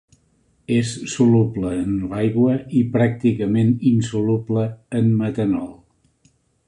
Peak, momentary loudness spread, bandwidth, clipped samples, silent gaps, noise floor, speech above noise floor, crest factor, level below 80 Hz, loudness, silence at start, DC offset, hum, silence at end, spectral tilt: -4 dBFS; 7 LU; 10.5 kHz; under 0.1%; none; -61 dBFS; 43 dB; 16 dB; -48 dBFS; -20 LUFS; 0.7 s; under 0.1%; none; 0.95 s; -7.5 dB/octave